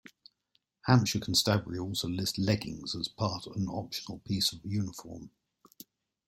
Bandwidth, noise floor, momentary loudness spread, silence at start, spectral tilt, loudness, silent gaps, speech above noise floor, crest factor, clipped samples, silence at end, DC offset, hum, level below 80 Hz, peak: 16.5 kHz; -76 dBFS; 13 LU; 0.85 s; -4.5 dB/octave; -31 LUFS; none; 45 dB; 24 dB; under 0.1%; 1 s; under 0.1%; none; -60 dBFS; -8 dBFS